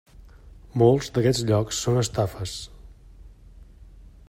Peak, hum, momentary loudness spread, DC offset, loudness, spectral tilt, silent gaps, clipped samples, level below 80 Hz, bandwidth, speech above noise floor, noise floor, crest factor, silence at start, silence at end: -6 dBFS; none; 14 LU; under 0.1%; -23 LUFS; -5.5 dB/octave; none; under 0.1%; -46 dBFS; 16 kHz; 25 dB; -48 dBFS; 20 dB; 0.2 s; 0.25 s